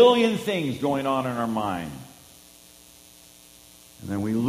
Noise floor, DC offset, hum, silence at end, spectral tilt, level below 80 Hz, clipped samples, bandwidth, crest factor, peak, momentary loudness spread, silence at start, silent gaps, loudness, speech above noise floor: -51 dBFS; under 0.1%; none; 0 s; -5.5 dB/octave; -60 dBFS; under 0.1%; 15.5 kHz; 20 dB; -4 dBFS; 25 LU; 0 s; none; -25 LUFS; 28 dB